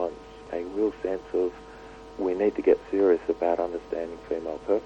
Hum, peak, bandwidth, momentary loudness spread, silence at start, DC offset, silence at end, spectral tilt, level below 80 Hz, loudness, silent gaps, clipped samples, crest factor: none; -8 dBFS; 8.2 kHz; 17 LU; 0 s; under 0.1%; 0 s; -7 dB/octave; -54 dBFS; -27 LUFS; none; under 0.1%; 18 dB